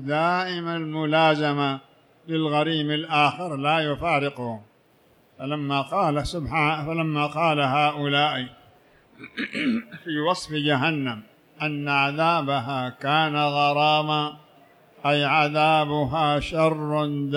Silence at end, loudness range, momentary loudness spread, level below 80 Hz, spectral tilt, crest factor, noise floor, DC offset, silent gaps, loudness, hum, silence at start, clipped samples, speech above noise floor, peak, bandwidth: 0 s; 4 LU; 10 LU; -52 dBFS; -6 dB/octave; 18 dB; -59 dBFS; under 0.1%; none; -23 LUFS; none; 0 s; under 0.1%; 36 dB; -6 dBFS; 12 kHz